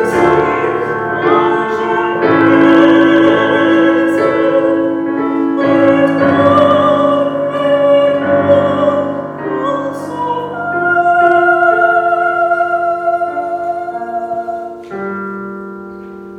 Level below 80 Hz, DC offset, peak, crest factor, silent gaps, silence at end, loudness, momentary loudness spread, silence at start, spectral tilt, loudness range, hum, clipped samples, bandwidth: -50 dBFS; under 0.1%; 0 dBFS; 12 dB; none; 0 s; -12 LUFS; 12 LU; 0 s; -7 dB/octave; 6 LU; none; 0.1%; 9.6 kHz